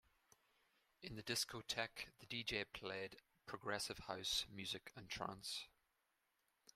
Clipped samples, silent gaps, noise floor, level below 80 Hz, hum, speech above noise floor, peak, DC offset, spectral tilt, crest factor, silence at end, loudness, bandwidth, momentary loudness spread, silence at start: under 0.1%; none; -86 dBFS; -72 dBFS; none; 38 dB; -24 dBFS; under 0.1%; -2 dB/octave; 26 dB; 1.05 s; -46 LUFS; 15.5 kHz; 12 LU; 1 s